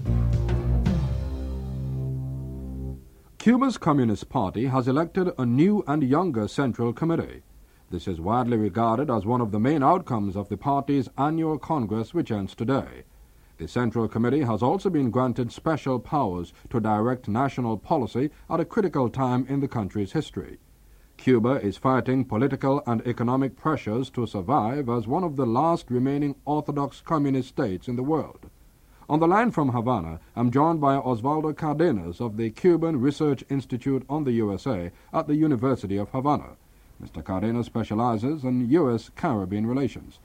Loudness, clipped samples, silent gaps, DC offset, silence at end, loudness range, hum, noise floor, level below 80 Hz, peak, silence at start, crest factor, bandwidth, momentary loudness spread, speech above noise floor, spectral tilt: -25 LUFS; under 0.1%; none; under 0.1%; 0.15 s; 3 LU; none; -54 dBFS; -40 dBFS; -6 dBFS; 0 s; 18 dB; 15.5 kHz; 9 LU; 29 dB; -8.5 dB/octave